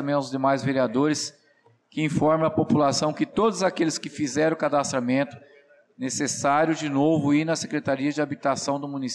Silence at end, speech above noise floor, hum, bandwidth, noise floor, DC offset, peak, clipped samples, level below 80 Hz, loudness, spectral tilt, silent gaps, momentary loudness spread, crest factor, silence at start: 0 s; 38 dB; none; 12 kHz; -61 dBFS; under 0.1%; -12 dBFS; under 0.1%; -64 dBFS; -24 LUFS; -5 dB/octave; none; 7 LU; 12 dB; 0 s